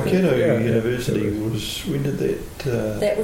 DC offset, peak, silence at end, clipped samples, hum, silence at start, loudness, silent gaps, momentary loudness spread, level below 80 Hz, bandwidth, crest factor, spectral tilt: under 0.1%; -6 dBFS; 0 s; under 0.1%; none; 0 s; -22 LUFS; none; 7 LU; -40 dBFS; 17 kHz; 14 dB; -6.5 dB/octave